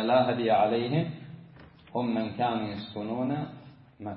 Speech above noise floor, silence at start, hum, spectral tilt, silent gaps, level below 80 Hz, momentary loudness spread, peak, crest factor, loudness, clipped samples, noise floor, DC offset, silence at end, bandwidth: 24 dB; 0 s; none; -10.5 dB/octave; none; -66 dBFS; 19 LU; -12 dBFS; 18 dB; -29 LUFS; under 0.1%; -52 dBFS; under 0.1%; 0 s; 5.4 kHz